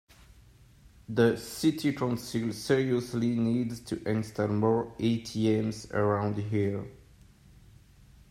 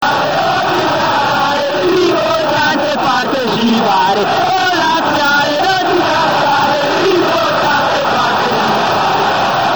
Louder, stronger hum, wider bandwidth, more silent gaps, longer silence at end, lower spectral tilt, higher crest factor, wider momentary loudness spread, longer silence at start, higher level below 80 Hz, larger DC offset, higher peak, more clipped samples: second, -29 LUFS vs -12 LUFS; neither; second, 16 kHz vs over 20 kHz; neither; first, 1.35 s vs 0 s; first, -6.5 dB/octave vs -4 dB/octave; first, 20 dB vs 12 dB; first, 6 LU vs 2 LU; first, 1.1 s vs 0 s; second, -58 dBFS vs -52 dBFS; second, under 0.1% vs 0.8%; second, -10 dBFS vs -2 dBFS; neither